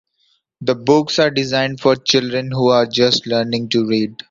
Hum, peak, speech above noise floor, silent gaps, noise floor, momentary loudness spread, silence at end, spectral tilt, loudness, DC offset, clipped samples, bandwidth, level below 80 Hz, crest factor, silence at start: none; 0 dBFS; 47 dB; none; -63 dBFS; 6 LU; 0.15 s; -4.5 dB/octave; -16 LUFS; under 0.1%; under 0.1%; 7.6 kHz; -56 dBFS; 16 dB; 0.6 s